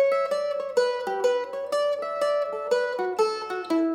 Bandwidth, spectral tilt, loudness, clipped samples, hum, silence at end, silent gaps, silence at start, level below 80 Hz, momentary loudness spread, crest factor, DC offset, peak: 15 kHz; -3 dB/octave; -26 LUFS; under 0.1%; none; 0 s; none; 0 s; -76 dBFS; 2 LU; 14 dB; under 0.1%; -10 dBFS